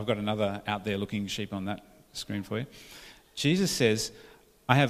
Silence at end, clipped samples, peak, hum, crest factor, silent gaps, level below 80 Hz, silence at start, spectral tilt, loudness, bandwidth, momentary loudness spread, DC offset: 0 s; under 0.1%; -4 dBFS; none; 26 dB; none; -58 dBFS; 0 s; -5 dB/octave; -30 LUFS; 15.5 kHz; 17 LU; under 0.1%